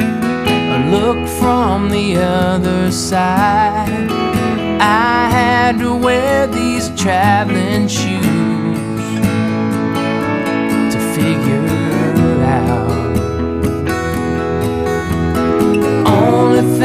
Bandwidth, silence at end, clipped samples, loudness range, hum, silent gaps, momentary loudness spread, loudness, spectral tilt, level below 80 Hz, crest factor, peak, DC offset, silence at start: 15.5 kHz; 0 s; under 0.1%; 3 LU; none; none; 6 LU; -14 LUFS; -6 dB/octave; -32 dBFS; 14 dB; 0 dBFS; under 0.1%; 0 s